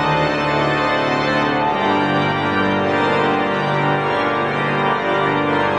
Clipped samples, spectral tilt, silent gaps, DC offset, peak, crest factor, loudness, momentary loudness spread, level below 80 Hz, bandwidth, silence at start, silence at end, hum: under 0.1%; -6 dB/octave; none; under 0.1%; -6 dBFS; 12 dB; -17 LUFS; 1 LU; -46 dBFS; 9.8 kHz; 0 s; 0 s; none